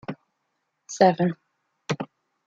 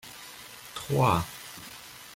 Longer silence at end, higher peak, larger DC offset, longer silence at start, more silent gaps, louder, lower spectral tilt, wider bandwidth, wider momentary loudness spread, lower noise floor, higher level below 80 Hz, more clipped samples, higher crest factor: first, 0.4 s vs 0 s; first, -4 dBFS vs -10 dBFS; neither; about the same, 0.1 s vs 0.05 s; neither; first, -24 LUFS vs -28 LUFS; about the same, -6 dB/octave vs -5 dB/octave; second, 7.8 kHz vs 16.5 kHz; first, 22 LU vs 19 LU; first, -77 dBFS vs -46 dBFS; second, -70 dBFS vs -56 dBFS; neither; about the same, 22 dB vs 22 dB